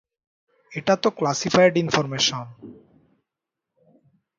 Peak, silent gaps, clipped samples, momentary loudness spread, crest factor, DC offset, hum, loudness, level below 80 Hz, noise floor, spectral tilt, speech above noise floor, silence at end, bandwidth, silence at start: -2 dBFS; none; under 0.1%; 17 LU; 22 dB; under 0.1%; none; -21 LUFS; -64 dBFS; -85 dBFS; -4 dB/octave; 64 dB; 1.65 s; 7.6 kHz; 0.7 s